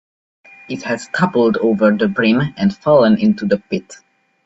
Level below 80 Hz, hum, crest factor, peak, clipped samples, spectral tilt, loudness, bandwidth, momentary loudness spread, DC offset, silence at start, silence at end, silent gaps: -54 dBFS; none; 16 dB; 0 dBFS; under 0.1%; -7 dB/octave; -15 LUFS; 8 kHz; 12 LU; under 0.1%; 0.7 s; 0.5 s; none